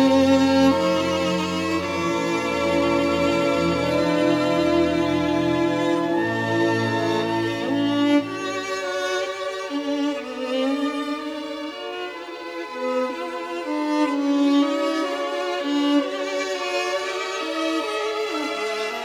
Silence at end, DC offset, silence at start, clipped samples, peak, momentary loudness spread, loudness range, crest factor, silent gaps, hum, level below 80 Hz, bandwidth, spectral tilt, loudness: 0 s; under 0.1%; 0 s; under 0.1%; -6 dBFS; 9 LU; 6 LU; 16 dB; none; none; -58 dBFS; 14 kHz; -5 dB/octave; -22 LUFS